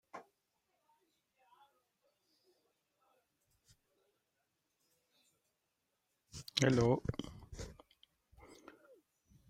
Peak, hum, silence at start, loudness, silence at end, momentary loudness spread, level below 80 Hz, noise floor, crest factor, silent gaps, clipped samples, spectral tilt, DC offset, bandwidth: -14 dBFS; none; 0.15 s; -35 LUFS; 0.95 s; 25 LU; -64 dBFS; -85 dBFS; 30 dB; none; under 0.1%; -5.5 dB/octave; under 0.1%; 16 kHz